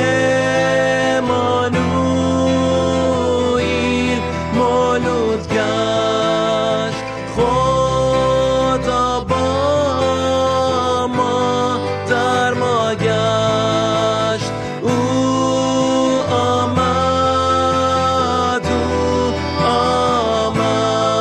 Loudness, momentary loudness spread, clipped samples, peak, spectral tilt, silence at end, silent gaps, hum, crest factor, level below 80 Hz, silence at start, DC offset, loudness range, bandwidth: -16 LUFS; 3 LU; under 0.1%; -4 dBFS; -5 dB/octave; 0 s; none; none; 12 dB; -36 dBFS; 0 s; under 0.1%; 1 LU; 11.5 kHz